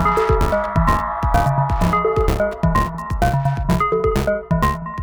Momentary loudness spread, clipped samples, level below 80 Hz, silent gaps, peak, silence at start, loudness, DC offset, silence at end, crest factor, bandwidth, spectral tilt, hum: 3 LU; under 0.1%; -24 dBFS; none; -4 dBFS; 0 s; -19 LUFS; under 0.1%; 0 s; 14 dB; over 20 kHz; -7 dB/octave; none